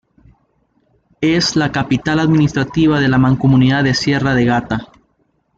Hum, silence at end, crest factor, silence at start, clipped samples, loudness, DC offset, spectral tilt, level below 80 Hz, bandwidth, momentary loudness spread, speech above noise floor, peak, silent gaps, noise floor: none; 0.75 s; 12 dB; 1.2 s; under 0.1%; -14 LUFS; under 0.1%; -6 dB/octave; -40 dBFS; 7.8 kHz; 6 LU; 49 dB; -2 dBFS; none; -62 dBFS